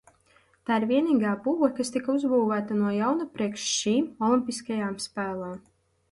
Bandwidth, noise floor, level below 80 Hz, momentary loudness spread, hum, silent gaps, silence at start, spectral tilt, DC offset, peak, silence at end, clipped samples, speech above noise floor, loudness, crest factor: 11.5 kHz; -63 dBFS; -68 dBFS; 8 LU; none; none; 0.7 s; -4.5 dB/octave; under 0.1%; -10 dBFS; 0.5 s; under 0.1%; 37 dB; -26 LUFS; 16 dB